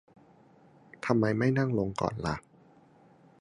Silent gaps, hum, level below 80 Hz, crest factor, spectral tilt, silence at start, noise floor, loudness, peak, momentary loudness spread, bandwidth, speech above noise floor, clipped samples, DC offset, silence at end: none; none; -56 dBFS; 24 dB; -7.5 dB/octave; 1.05 s; -59 dBFS; -30 LUFS; -8 dBFS; 10 LU; 11 kHz; 31 dB; under 0.1%; under 0.1%; 1 s